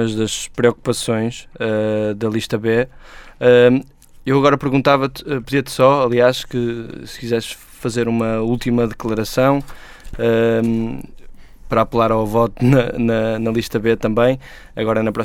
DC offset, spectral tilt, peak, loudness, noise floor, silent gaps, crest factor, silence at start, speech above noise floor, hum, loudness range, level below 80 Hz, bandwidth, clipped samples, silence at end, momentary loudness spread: under 0.1%; -6 dB/octave; 0 dBFS; -17 LUFS; -36 dBFS; none; 18 dB; 0 s; 19 dB; none; 4 LU; -40 dBFS; 17 kHz; under 0.1%; 0 s; 11 LU